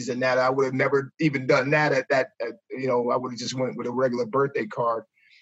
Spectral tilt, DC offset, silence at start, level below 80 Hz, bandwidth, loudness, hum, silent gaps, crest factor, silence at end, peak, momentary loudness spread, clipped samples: -5.5 dB/octave; under 0.1%; 0 s; -74 dBFS; 8.2 kHz; -24 LUFS; none; none; 16 dB; 0.4 s; -10 dBFS; 9 LU; under 0.1%